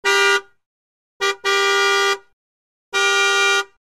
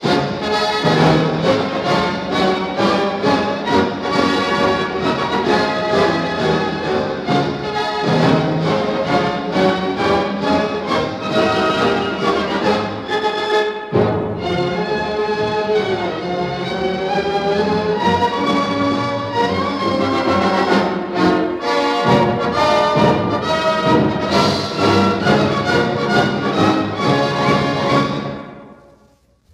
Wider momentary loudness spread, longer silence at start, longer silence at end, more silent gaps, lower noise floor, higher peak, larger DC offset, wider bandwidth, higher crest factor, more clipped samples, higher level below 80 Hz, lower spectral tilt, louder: first, 8 LU vs 5 LU; about the same, 0.05 s vs 0 s; second, 0.15 s vs 0.8 s; first, 0.66-1.20 s, 2.33-2.92 s vs none; first, under -90 dBFS vs -54 dBFS; second, -4 dBFS vs 0 dBFS; first, 0.2% vs under 0.1%; first, 16 kHz vs 13.5 kHz; about the same, 16 dB vs 16 dB; neither; second, -72 dBFS vs -44 dBFS; second, 1.5 dB/octave vs -6 dB/octave; about the same, -17 LUFS vs -17 LUFS